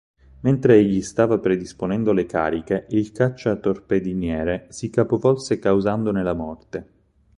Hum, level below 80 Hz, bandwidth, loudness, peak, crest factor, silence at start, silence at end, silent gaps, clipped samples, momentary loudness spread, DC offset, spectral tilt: none; -46 dBFS; 11 kHz; -21 LUFS; -2 dBFS; 18 dB; 0.4 s; 0.55 s; none; under 0.1%; 9 LU; under 0.1%; -7.5 dB/octave